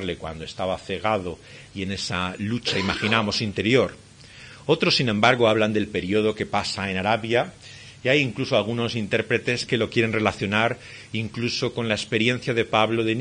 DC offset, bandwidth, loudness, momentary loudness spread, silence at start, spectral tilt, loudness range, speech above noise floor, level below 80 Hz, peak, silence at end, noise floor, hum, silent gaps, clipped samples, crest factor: under 0.1%; 10.5 kHz; -23 LUFS; 13 LU; 0 s; -5 dB/octave; 3 LU; 21 dB; -56 dBFS; -2 dBFS; 0 s; -45 dBFS; none; none; under 0.1%; 22 dB